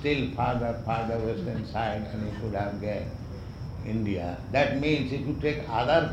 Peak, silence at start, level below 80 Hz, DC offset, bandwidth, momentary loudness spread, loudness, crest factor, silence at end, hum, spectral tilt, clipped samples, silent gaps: -10 dBFS; 0 s; -44 dBFS; under 0.1%; 10 kHz; 11 LU; -29 LUFS; 18 dB; 0 s; none; -7.5 dB/octave; under 0.1%; none